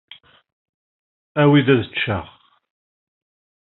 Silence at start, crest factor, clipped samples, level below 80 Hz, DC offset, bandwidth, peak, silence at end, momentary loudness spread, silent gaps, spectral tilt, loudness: 1.35 s; 20 dB; under 0.1%; -58 dBFS; under 0.1%; 4.1 kHz; -2 dBFS; 1.35 s; 13 LU; none; -5 dB/octave; -18 LUFS